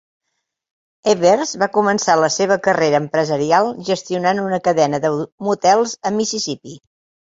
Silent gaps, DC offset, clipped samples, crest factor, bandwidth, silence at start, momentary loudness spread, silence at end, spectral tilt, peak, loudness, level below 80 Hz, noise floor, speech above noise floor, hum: 5.32-5.38 s; under 0.1%; under 0.1%; 16 dB; 8 kHz; 1.05 s; 7 LU; 0.5 s; -4 dB/octave; -2 dBFS; -17 LUFS; -60 dBFS; -75 dBFS; 59 dB; none